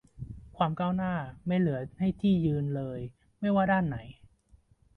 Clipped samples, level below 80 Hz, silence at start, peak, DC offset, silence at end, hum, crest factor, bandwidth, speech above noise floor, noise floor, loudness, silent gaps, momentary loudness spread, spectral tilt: under 0.1%; -54 dBFS; 0.2 s; -12 dBFS; under 0.1%; 0.85 s; none; 18 dB; 4.2 kHz; 34 dB; -62 dBFS; -30 LUFS; none; 15 LU; -9.5 dB/octave